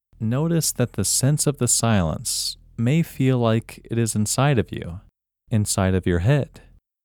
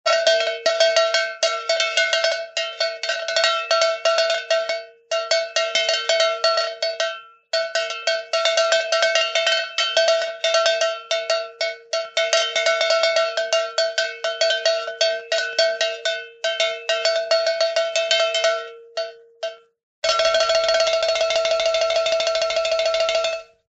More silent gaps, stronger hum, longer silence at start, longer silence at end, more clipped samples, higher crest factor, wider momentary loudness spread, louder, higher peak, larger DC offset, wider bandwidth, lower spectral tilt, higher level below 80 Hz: second, none vs 19.83-20.02 s; neither; first, 0.2 s vs 0.05 s; first, 0.45 s vs 0.25 s; neither; about the same, 16 dB vs 20 dB; about the same, 9 LU vs 8 LU; about the same, -21 LUFS vs -20 LUFS; second, -6 dBFS vs -2 dBFS; neither; first, 19.5 kHz vs 8.2 kHz; first, -5 dB/octave vs 2.5 dB/octave; first, -44 dBFS vs -64 dBFS